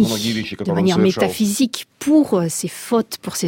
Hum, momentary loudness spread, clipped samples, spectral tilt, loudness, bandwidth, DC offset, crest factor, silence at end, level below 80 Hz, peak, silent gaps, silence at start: none; 8 LU; under 0.1%; -5 dB/octave; -18 LUFS; 17 kHz; under 0.1%; 14 dB; 0 s; -56 dBFS; -4 dBFS; none; 0 s